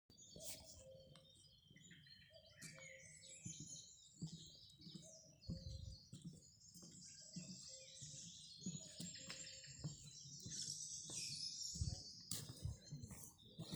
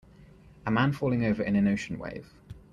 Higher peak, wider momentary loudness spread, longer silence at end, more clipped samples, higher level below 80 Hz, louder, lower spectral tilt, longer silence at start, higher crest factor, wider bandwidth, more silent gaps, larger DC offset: second, -26 dBFS vs -12 dBFS; about the same, 16 LU vs 15 LU; second, 0 s vs 0.15 s; neither; second, -66 dBFS vs -54 dBFS; second, -53 LUFS vs -28 LUFS; second, -3 dB/octave vs -7.5 dB/octave; about the same, 0.1 s vs 0.2 s; first, 28 dB vs 16 dB; first, over 20 kHz vs 9.2 kHz; neither; neither